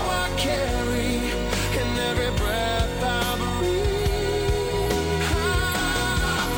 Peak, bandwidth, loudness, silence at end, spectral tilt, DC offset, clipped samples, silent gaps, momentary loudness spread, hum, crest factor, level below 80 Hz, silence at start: -10 dBFS; over 20 kHz; -24 LUFS; 0 s; -4.5 dB/octave; under 0.1%; under 0.1%; none; 2 LU; none; 14 dB; -30 dBFS; 0 s